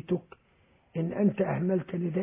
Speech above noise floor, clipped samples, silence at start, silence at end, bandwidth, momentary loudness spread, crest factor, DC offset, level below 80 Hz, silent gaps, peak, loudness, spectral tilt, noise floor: 36 dB; under 0.1%; 0.05 s; 0 s; 3.7 kHz; 7 LU; 16 dB; under 0.1%; -64 dBFS; none; -14 dBFS; -30 LUFS; -9 dB/octave; -65 dBFS